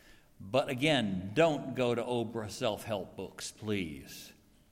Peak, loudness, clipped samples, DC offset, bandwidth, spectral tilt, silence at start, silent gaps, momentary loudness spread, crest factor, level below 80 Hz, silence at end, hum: -14 dBFS; -33 LUFS; under 0.1%; under 0.1%; 16.5 kHz; -5 dB/octave; 0.4 s; none; 17 LU; 20 dB; -64 dBFS; 0.4 s; none